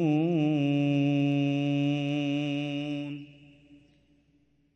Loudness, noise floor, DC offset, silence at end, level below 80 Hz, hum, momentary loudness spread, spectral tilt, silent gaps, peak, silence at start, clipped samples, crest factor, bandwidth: -28 LUFS; -67 dBFS; under 0.1%; 1 s; -72 dBFS; none; 9 LU; -8 dB/octave; none; -16 dBFS; 0 s; under 0.1%; 12 dB; 6.6 kHz